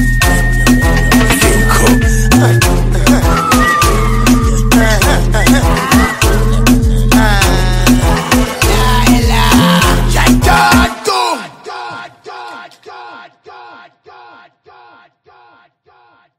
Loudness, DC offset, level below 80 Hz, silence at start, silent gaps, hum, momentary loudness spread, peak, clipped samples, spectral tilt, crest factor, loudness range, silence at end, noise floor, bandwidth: -10 LUFS; under 0.1%; -16 dBFS; 0 s; none; none; 16 LU; 0 dBFS; under 0.1%; -4.5 dB/octave; 10 dB; 7 LU; 2.7 s; -49 dBFS; 16.5 kHz